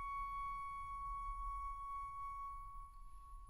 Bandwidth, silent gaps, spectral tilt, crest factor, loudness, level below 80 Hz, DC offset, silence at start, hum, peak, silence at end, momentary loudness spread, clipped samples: 15.5 kHz; none; -3.5 dB/octave; 12 dB; -47 LUFS; -54 dBFS; under 0.1%; 0 s; none; -36 dBFS; 0 s; 12 LU; under 0.1%